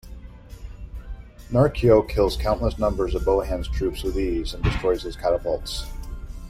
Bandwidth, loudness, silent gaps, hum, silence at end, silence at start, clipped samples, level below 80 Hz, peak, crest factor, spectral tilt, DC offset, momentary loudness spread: 16 kHz; -23 LUFS; none; none; 0 s; 0.05 s; under 0.1%; -32 dBFS; -6 dBFS; 18 dB; -6.5 dB/octave; under 0.1%; 23 LU